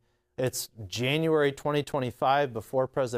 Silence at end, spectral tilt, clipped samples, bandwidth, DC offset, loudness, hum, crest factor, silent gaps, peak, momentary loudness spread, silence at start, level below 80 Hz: 0 s; -5 dB/octave; under 0.1%; 16 kHz; under 0.1%; -28 LUFS; none; 16 dB; none; -12 dBFS; 8 LU; 0.4 s; -62 dBFS